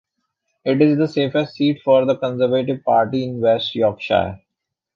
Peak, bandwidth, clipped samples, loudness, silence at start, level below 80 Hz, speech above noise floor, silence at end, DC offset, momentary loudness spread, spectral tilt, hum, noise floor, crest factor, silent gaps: -2 dBFS; 7 kHz; under 0.1%; -18 LUFS; 0.65 s; -52 dBFS; 64 dB; 0.6 s; under 0.1%; 5 LU; -8 dB/octave; none; -81 dBFS; 16 dB; none